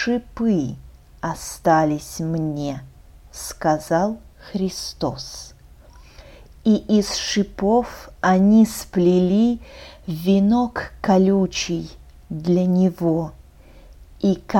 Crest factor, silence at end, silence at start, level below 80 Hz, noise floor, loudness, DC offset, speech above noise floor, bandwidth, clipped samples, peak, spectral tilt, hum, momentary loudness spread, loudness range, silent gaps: 16 dB; 0 s; 0 s; -44 dBFS; -46 dBFS; -20 LUFS; under 0.1%; 26 dB; 17 kHz; under 0.1%; -4 dBFS; -6 dB/octave; none; 17 LU; 7 LU; none